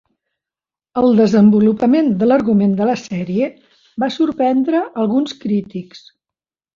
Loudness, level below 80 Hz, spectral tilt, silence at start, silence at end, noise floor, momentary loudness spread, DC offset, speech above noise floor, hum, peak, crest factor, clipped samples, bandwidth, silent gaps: -15 LUFS; -56 dBFS; -7.5 dB/octave; 0.95 s; 0.8 s; -90 dBFS; 11 LU; under 0.1%; 75 dB; none; -2 dBFS; 14 dB; under 0.1%; 7.2 kHz; none